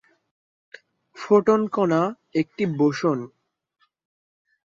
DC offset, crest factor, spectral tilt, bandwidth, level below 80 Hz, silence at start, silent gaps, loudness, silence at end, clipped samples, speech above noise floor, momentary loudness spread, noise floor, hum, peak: under 0.1%; 18 dB; -7 dB/octave; 7.6 kHz; -68 dBFS; 1.15 s; none; -22 LUFS; 1.45 s; under 0.1%; 48 dB; 11 LU; -70 dBFS; none; -6 dBFS